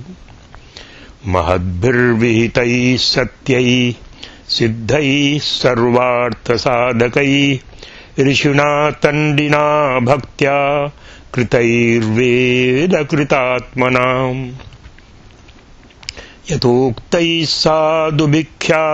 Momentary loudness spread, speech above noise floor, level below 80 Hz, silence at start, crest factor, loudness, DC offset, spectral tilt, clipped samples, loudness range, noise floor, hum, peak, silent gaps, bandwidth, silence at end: 10 LU; 28 dB; -40 dBFS; 0 s; 14 dB; -14 LUFS; under 0.1%; -5.5 dB/octave; under 0.1%; 4 LU; -42 dBFS; none; 0 dBFS; none; 8.4 kHz; 0 s